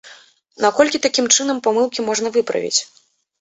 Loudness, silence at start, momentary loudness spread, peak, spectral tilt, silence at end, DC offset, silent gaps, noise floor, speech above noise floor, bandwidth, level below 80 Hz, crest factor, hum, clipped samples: -17 LUFS; 0.05 s; 6 LU; 0 dBFS; -1 dB/octave; 0.55 s; under 0.1%; none; -47 dBFS; 29 dB; 8.2 kHz; -62 dBFS; 20 dB; none; under 0.1%